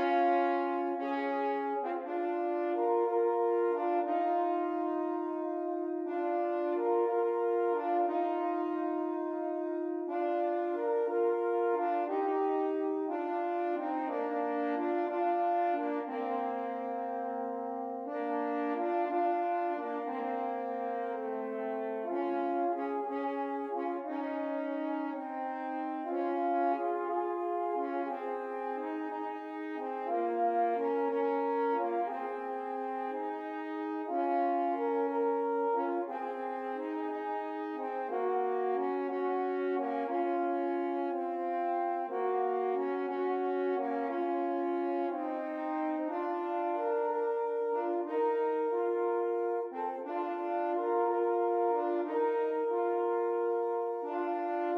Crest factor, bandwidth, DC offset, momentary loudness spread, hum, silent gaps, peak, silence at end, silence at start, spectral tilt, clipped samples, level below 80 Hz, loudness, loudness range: 14 dB; 5.2 kHz; under 0.1%; 7 LU; none; none; -18 dBFS; 0 s; 0 s; -6 dB/octave; under 0.1%; under -90 dBFS; -33 LUFS; 3 LU